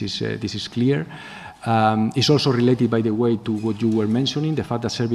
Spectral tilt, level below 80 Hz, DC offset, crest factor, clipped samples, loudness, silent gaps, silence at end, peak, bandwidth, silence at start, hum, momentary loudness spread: -6 dB/octave; -56 dBFS; under 0.1%; 16 dB; under 0.1%; -21 LUFS; none; 0 s; -4 dBFS; 12.5 kHz; 0 s; none; 9 LU